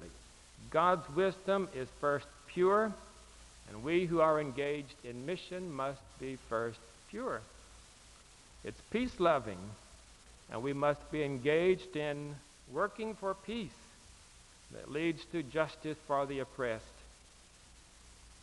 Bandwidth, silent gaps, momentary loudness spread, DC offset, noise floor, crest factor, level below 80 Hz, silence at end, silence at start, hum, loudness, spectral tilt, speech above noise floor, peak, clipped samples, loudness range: 11.5 kHz; none; 24 LU; under 0.1%; -60 dBFS; 22 dB; -62 dBFS; 0 s; 0 s; none; -35 LUFS; -6 dB/octave; 25 dB; -14 dBFS; under 0.1%; 7 LU